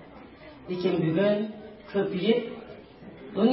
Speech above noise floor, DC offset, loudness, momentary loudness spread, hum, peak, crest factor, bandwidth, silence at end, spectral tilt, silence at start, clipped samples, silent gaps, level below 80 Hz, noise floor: 21 dB; under 0.1%; -27 LUFS; 22 LU; none; -10 dBFS; 18 dB; 5.8 kHz; 0 s; -11 dB/octave; 0 s; under 0.1%; none; -62 dBFS; -47 dBFS